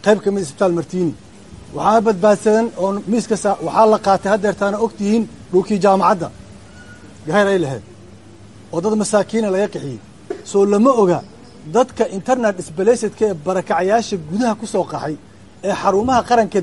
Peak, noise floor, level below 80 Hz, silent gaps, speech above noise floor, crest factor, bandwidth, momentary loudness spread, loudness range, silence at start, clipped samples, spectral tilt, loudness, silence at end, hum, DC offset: -2 dBFS; -41 dBFS; -50 dBFS; none; 25 dB; 16 dB; 11.5 kHz; 12 LU; 4 LU; 0.05 s; under 0.1%; -5.5 dB/octave; -17 LUFS; 0 s; none; 0.4%